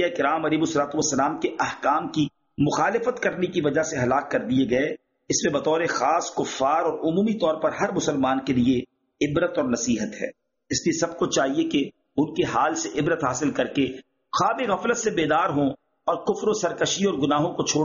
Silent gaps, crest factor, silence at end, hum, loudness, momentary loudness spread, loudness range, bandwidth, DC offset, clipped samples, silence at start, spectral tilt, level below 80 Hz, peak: none; 16 dB; 0 s; none; -24 LUFS; 5 LU; 2 LU; 7.4 kHz; under 0.1%; under 0.1%; 0 s; -4 dB/octave; -56 dBFS; -8 dBFS